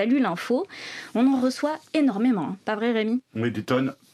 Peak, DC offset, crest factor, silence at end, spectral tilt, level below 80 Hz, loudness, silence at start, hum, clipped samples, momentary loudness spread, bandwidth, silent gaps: -8 dBFS; under 0.1%; 16 dB; 0.2 s; -6 dB/octave; -76 dBFS; -25 LUFS; 0 s; none; under 0.1%; 7 LU; 13 kHz; none